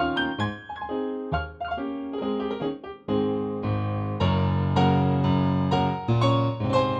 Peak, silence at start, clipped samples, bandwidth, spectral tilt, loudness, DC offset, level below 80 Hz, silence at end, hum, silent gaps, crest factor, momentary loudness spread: -10 dBFS; 0 s; under 0.1%; 8.2 kHz; -8 dB/octave; -26 LUFS; under 0.1%; -48 dBFS; 0 s; none; none; 16 dB; 9 LU